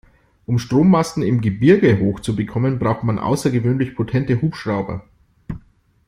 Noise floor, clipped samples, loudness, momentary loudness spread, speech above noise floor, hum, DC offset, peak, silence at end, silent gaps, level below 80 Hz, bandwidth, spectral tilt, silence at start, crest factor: -52 dBFS; under 0.1%; -18 LUFS; 18 LU; 35 dB; none; under 0.1%; -2 dBFS; 0.5 s; none; -46 dBFS; 14.5 kHz; -7.5 dB/octave; 0.5 s; 16 dB